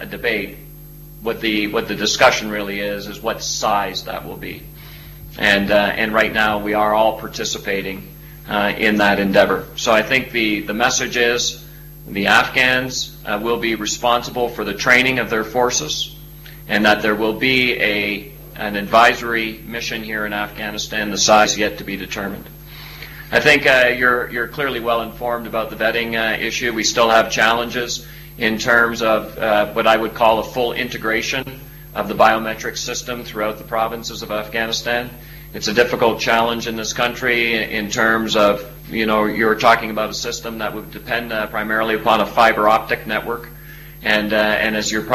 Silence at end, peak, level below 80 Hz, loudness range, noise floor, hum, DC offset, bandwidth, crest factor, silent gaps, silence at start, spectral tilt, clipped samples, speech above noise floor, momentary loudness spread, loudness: 0 s; 0 dBFS; -42 dBFS; 3 LU; -38 dBFS; none; under 0.1%; 16 kHz; 18 dB; none; 0 s; -3 dB/octave; under 0.1%; 20 dB; 14 LU; -17 LUFS